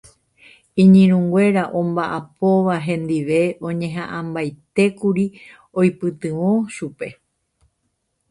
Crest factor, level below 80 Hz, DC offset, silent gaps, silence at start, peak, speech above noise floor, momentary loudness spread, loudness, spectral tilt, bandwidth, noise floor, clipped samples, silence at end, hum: 16 dB; -58 dBFS; under 0.1%; none; 0.75 s; -2 dBFS; 54 dB; 14 LU; -19 LUFS; -8 dB/octave; 11 kHz; -71 dBFS; under 0.1%; 1.2 s; none